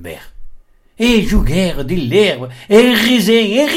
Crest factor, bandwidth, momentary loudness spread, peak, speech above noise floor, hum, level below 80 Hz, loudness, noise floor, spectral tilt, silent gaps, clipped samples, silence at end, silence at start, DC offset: 14 dB; 16.5 kHz; 8 LU; 0 dBFS; 24 dB; none; -26 dBFS; -12 LUFS; -37 dBFS; -5 dB/octave; none; under 0.1%; 0 s; 0 s; under 0.1%